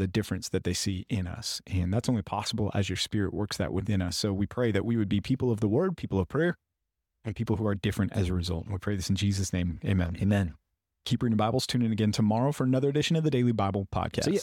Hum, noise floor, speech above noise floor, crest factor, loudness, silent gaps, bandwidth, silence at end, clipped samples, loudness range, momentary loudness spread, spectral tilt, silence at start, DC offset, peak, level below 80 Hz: none; -84 dBFS; 56 dB; 14 dB; -29 LUFS; none; 16 kHz; 0 s; under 0.1%; 4 LU; 6 LU; -6 dB/octave; 0 s; under 0.1%; -14 dBFS; -48 dBFS